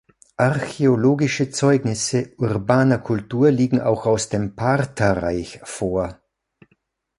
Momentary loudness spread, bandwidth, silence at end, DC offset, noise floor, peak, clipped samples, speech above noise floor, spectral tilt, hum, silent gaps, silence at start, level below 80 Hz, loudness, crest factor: 8 LU; 11.5 kHz; 1.05 s; under 0.1%; -66 dBFS; -2 dBFS; under 0.1%; 47 dB; -6 dB/octave; none; none; 0.4 s; -46 dBFS; -20 LUFS; 18 dB